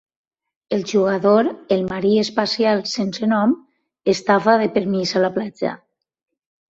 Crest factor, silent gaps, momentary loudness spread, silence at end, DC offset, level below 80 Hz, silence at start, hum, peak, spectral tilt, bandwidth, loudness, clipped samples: 18 dB; none; 10 LU; 1 s; under 0.1%; -60 dBFS; 0.7 s; none; -2 dBFS; -5.5 dB/octave; 8 kHz; -19 LUFS; under 0.1%